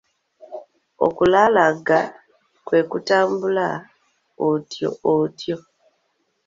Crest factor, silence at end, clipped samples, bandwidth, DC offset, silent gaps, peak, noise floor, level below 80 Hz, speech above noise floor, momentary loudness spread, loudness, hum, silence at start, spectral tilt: 20 dB; 0.85 s; under 0.1%; 7.6 kHz; under 0.1%; none; -2 dBFS; -69 dBFS; -58 dBFS; 51 dB; 16 LU; -20 LUFS; none; 0.5 s; -6 dB/octave